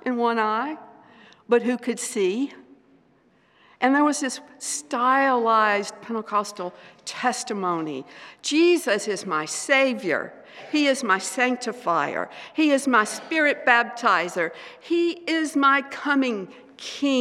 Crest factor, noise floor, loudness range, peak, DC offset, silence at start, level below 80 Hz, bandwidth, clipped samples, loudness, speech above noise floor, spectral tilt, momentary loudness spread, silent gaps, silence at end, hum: 22 dB; -60 dBFS; 4 LU; -2 dBFS; under 0.1%; 0.05 s; -82 dBFS; 14.5 kHz; under 0.1%; -23 LUFS; 37 dB; -3 dB/octave; 13 LU; none; 0 s; none